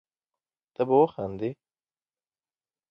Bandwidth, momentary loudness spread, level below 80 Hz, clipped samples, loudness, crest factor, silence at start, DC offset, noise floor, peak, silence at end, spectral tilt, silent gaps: 5.4 kHz; 13 LU; -66 dBFS; under 0.1%; -26 LUFS; 20 dB; 0.8 s; under 0.1%; under -90 dBFS; -10 dBFS; 1.35 s; -10 dB/octave; none